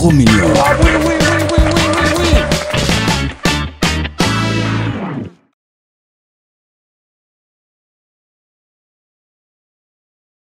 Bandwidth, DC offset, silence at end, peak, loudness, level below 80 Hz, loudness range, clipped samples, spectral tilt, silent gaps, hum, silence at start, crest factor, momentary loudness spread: 16.5 kHz; under 0.1%; 5.25 s; 0 dBFS; -13 LUFS; -24 dBFS; 13 LU; under 0.1%; -5 dB/octave; none; none; 0 s; 16 dB; 8 LU